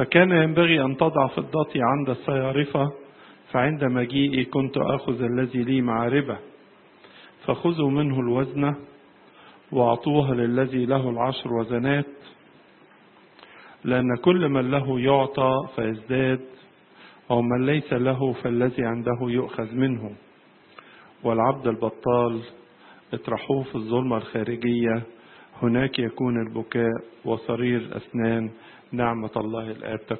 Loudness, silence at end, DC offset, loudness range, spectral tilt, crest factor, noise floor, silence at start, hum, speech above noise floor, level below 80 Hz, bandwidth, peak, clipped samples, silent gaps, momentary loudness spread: -24 LUFS; 0 s; under 0.1%; 4 LU; -11.5 dB/octave; 22 dB; -54 dBFS; 0 s; none; 31 dB; -58 dBFS; 4.4 kHz; -2 dBFS; under 0.1%; none; 9 LU